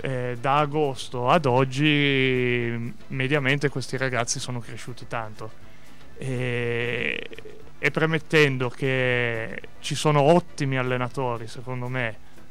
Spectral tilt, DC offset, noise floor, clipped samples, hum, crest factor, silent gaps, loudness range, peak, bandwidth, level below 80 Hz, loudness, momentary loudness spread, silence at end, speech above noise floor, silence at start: -5 dB/octave; 2%; -49 dBFS; under 0.1%; none; 18 dB; none; 7 LU; -6 dBFS; 14 kHz; -54 dBFS; -24 LUFS; 14 LU; 0.35 s; 25 dB; 0 s